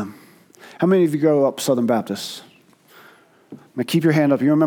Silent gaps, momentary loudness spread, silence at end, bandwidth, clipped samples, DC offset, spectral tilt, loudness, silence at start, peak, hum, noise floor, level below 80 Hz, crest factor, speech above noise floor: none; 15 LU; 0 s; 19 kHz; under 0.1%; under 0.1%; -6.5 dB/octave; -19 LUFS; 0 s; -4 dBFS; none; -51 dBFS; -76 dBFS; 16 dB; 33 dB